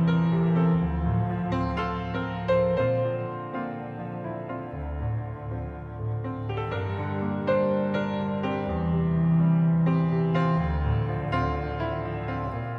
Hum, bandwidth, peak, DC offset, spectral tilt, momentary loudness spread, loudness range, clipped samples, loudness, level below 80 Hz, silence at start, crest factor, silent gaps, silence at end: none; 5.4 kHz; -12 dBFS; under 0.1%; -10 dB/octave; 12 LU; 8 LU; under 0.1%; -27 LUFS; -40 dBFS; 0 s; 14 dB; none; 0 s